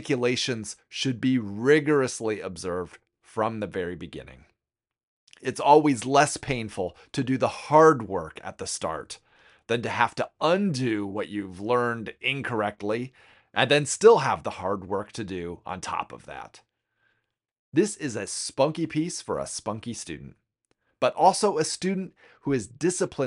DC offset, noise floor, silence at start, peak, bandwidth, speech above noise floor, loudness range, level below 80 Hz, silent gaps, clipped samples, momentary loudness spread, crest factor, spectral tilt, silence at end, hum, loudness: under 0.1%; under -90 dBFS; 0 s; -4 dBFS; 11.5 kHz; over 65 dB; 8 LU; -60 dBFS; 5.03-5.27 s, 17.59-17.72 s; under 0.1%; 16 LU; 22 dB; -4.5 dB/octave; 0 s; none; -25 LUFS